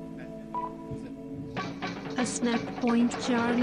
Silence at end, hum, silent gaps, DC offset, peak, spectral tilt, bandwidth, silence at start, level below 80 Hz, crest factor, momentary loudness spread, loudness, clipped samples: 0 s; none; none; under 0.1%; -16 dBFS; -4.5 dB/octave; 11 kHz; 0 s; -58 dBFS; 14 dB; 13 LU; -31 LUFS; under 0.1%